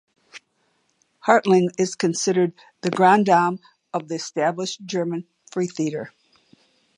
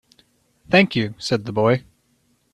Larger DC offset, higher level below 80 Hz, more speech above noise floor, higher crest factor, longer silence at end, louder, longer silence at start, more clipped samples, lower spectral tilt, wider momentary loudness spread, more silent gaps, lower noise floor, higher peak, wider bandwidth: neither; second, -74 dBFS vs -56 dBFS; about the same, 47 dB vs 45 dB; about the same, 22 dB vs 22 dB; first, 0.9 s vs 0.75 s; about the same, -21 LUFS vs -19 LUFS; second, 0.35 s vs 0.7 s; neither; about the same, -5 dB/octave vs -6 dB/octave; first, 15 LU vs 8 LU; neither; first, -68 dBFS vs -64 dBFS; about the same, -2 dBFS vs 0 dBFS; about the same, 11 kHz vs 12 kHz